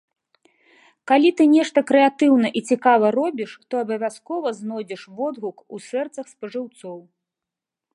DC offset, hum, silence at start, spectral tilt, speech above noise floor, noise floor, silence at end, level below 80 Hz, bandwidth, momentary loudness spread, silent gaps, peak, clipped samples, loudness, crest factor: under 0.1%; none; 1.05 s; -5 dB/octave; 67 dB; -87 dBFS; 0.95 s; -78 dBFS; 11.5 kHz; 18 LU; none; -2 dBFS; under 0.1%; -20 LUFS; 18 dB